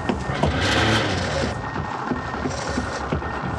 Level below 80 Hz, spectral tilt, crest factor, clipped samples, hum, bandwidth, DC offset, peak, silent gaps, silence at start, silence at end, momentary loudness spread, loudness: -36 dBFS; -5 dB/octave; 16 dB; under 0.1%; none; 13 kHz; under 0.1%; -6 dBFS; none; 0 s; 0 s; 8 LU; -23 LUFS